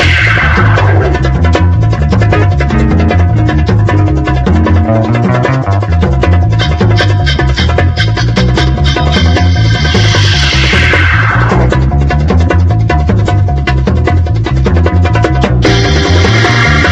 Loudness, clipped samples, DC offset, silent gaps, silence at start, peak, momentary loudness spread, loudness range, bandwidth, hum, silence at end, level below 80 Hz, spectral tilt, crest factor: -9 LUFS; under 0.1%; under 0.1%; none; 0 s; 0 dBFS; 3 LU; 2 LU; 8.2 kHz; none; 0 s; -14 dBFS; -6 dB/octave; 8 dB